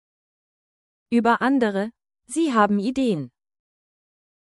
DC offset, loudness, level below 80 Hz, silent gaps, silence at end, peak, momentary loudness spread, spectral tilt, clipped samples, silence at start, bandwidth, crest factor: under 0.1%; -22 LUFS; -62 dBFS; none; 1.15 s; -4 dBFS; 11 LU; -5.5 dB/octave; under 0.1%; 1.1 s; 12 kHz; 20 dB